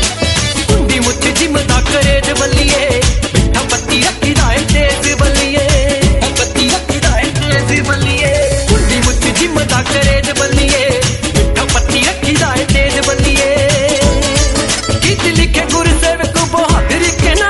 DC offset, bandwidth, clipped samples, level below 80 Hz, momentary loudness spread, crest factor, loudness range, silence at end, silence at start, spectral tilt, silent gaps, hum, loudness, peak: under 0.1%; 12 kHz; under 0.1%; -18 dBFS; 2 LU; 12 dB; 1 LU; 0 s; 0 s; -3.5 dB/octave; none; none; -11 LUFS; 0 dBFS